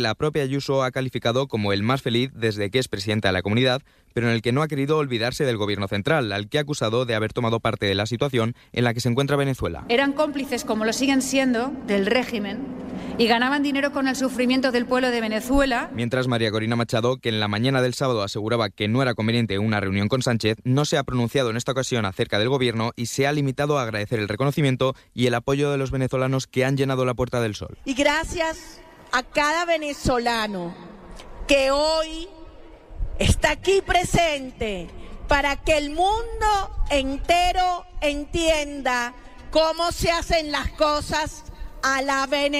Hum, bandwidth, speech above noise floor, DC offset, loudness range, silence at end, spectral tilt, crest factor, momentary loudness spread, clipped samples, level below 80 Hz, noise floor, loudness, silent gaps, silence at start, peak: none; 15.5 kHz; 20 dB; under 0.1%; 1 LU; 0 s; -5 dB/octave; 18 dB; 6 LU; under 0.1%; -38 dBFS; -43 dBFS; -23 LUFS; none; 0 s; -6 dBFS